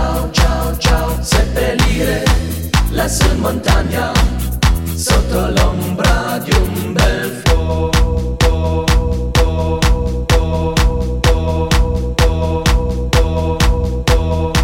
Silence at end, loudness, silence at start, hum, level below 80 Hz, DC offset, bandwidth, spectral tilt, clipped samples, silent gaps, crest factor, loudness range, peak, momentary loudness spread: 0 s; -15 LUFS; 0 s; none; -16 dBFS; 0.3%; 17 kHz; -5 dB/octave; under 0.1%; none; 12 dB; 0 LU; 0 dBFS; 2 LU